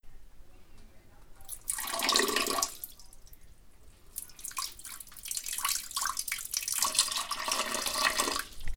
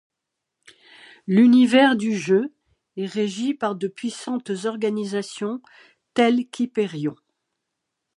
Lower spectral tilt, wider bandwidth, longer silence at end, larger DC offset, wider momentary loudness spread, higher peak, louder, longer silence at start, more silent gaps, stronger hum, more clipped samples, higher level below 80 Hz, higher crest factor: second, 0.5 dB/octave vs -5.5 dB/octave; first, over 20 kHz vs 11 kHz; second, 0 s vs 1.05 s; neither; about the same, 16 LU vs 15 LU; about the same, -6 dBFS vs -4 dBFS; second, -30 LUFS vs -22 LUFS; second, 0.05 s vs 1.25 s; neither; neither; neither; first, -50 dBFS vs -76 dBFS; first, 28 dB vs 20 dB